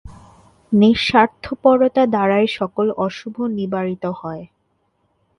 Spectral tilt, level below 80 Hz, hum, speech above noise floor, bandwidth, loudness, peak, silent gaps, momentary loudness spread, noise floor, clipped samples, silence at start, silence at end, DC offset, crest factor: -6.5 dB/octave; -50 dBFS; none; 49 dB; 10.5 kHz; -17 LUFS; 0 dBFS; none; 12 LU; -66 dBFS; under 0.1%; 0.05 s; 0.95 s; under 0.1%; 18 dB